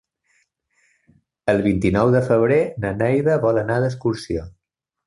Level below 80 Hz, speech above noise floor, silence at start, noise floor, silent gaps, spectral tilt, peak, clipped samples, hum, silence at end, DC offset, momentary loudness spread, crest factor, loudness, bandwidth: -44 dBFS; 62 dB; 1.45 s; -80 dBFS; none; -8 dB/octave; -4 dBFS; under 0.1%; none; 0.55 s; under 0.1%; 10 LU; 16 dB; -19 LUFS; 11.5 kHz